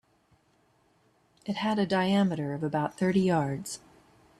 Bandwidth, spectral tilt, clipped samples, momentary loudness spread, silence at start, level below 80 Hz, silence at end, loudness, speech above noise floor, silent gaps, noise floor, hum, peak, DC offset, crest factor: 13 kHz; -6 dB/octave; under 0.1%; 13 LU; 1.45 s; -66 dBFS; 0.65 s; -28 LUFS; 40 dB; none; -67 dBFS; none; -14 dBFS; under 0.1%; 16 dB